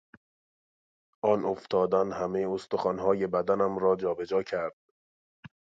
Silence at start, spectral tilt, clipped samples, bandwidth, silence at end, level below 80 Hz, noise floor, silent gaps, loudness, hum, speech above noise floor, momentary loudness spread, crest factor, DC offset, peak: 1.25 s; -7 dB/octave; under 0.1%; 7.8 kHz; 0.3 s; -64 dBFS; under -90 dBFS; 4.73-5.43 s; -29 LUFS; none; over 62 dB; 5 LU; 20 dB; under 0.1%; -10 dBFS